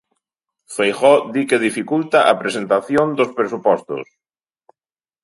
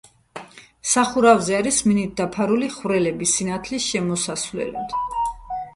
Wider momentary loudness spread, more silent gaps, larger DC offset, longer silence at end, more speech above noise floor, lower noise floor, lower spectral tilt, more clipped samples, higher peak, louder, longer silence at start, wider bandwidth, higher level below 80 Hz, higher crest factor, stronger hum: second, 7 LU vs 13 LU; neither; neither; first, 1.2 s vs 0.05 s; first, over 73 dB vs 20 dB; first, under -90 dBFS vs -41 dBFS; about the same, -4.5 dB/octave vs -3.5 dB/octave; neither; about the same, 0 dBFS vs -2 dBFS; first, -17 LUFS vs -21 LUFS; first, 0.7 s vs 0.35 s; about the same, 11.5 kHz vs 11.5 kHz; second, -64 dBFS vs -50 dBFS; about the same, 18 dB vs 20 dB; neither